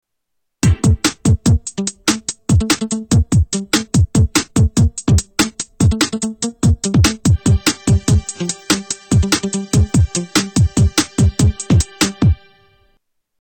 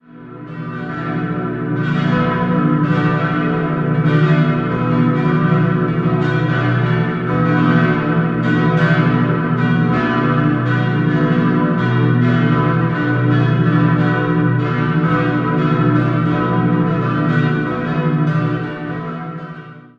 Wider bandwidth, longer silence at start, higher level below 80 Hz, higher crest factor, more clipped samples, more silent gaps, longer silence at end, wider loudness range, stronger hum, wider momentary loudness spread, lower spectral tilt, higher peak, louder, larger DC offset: first, 19 kHz vs 5.8 kHz; first, 0.65 s vs 0.1 s; first, -24 dBFS vs -44 dBFS; about the same, 12 dB vs 14 dB; neither; neither; first, 1.05 s vs 0.2 s; about the same, 1 LU vs 2 LU; neither; second, 4 LU vs 8 LU; second, -4.5 dB/octave vs -9.5 dB/octave; about the same, -4 dBFS vs -2 dBFS; about the same, -16 LUFS vs -16 LUFS; neither